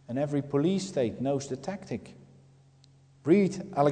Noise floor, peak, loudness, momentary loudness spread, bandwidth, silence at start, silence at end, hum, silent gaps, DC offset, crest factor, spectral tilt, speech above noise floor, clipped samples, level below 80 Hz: -59 dBFS; -10 dBFS; -29 LUFS; 13 LU; 9.4 kHz; 0.1 s; 0 s; none; none; under 0.1%; 18 dB; -7 dB/octave; 31 dB; under 0.1%; -66 dBFS